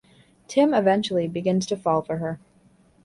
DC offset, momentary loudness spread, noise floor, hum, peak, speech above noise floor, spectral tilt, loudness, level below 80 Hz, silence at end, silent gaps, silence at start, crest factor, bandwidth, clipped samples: under 0.1%; 10 LU; -58 dBFS; none; -8 dBFS; 36 dB; -6 dB/octave; -23 LUFS; -62 dBFS; 0.7 s; none; 0.5 s; 16 dB; 11.5 kHz; under 0.1%